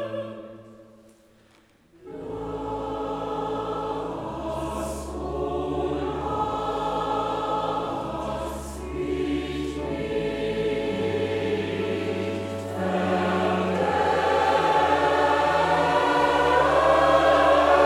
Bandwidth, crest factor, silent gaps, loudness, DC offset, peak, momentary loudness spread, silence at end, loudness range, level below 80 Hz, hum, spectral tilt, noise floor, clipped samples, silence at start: 15.5 kHz; 18 dB; none; -24 LUFS; under 0.1%; -6 dBFS; 13 LU; 0 s; 11 LU; -44 dBFS; none; -5.5 dB/octave; -58 dBFS; under 0.1%; 0 s